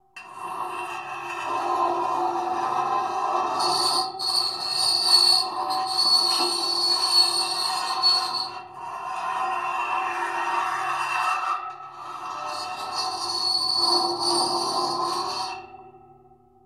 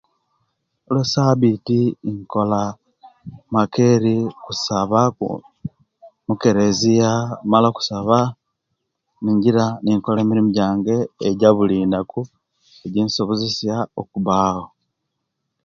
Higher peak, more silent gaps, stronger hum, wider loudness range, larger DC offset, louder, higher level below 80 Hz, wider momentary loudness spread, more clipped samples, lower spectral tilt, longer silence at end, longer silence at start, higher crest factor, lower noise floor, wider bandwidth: second, -6 dBFS vs 0 dBFS; neither; neither; first, 8 LU vs 3 LU; neither; second, -22 LUFS vs -19 LUFS; second, -72 dBFS vs -54 dBFS; first, 15 LU vs 11 LU; neither; second, -0.5 dB/octave vs -6.5 dB/octave; second, 0.7 s vs 1 s; second, 0.15 s vs 0.9 s; about the same, 20 dB vs 20 dB; second, -55 dBFS vs -77 dBFS; first, 16 kHz vs 7.6 kHz